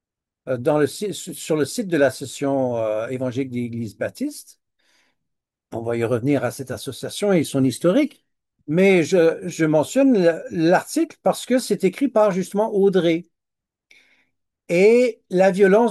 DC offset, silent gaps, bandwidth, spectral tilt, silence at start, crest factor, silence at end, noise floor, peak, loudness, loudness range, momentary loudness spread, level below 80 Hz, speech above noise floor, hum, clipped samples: under 0.1%; none; 12.5 kHz; -6 dB/octave; 0.45 s; 16 dB; 0 s; -84 dBFS; -4 dBFS; -20 LUFS; 8 LU; 13 LU; -70 dBFS; 65 dB; none; under 0.1%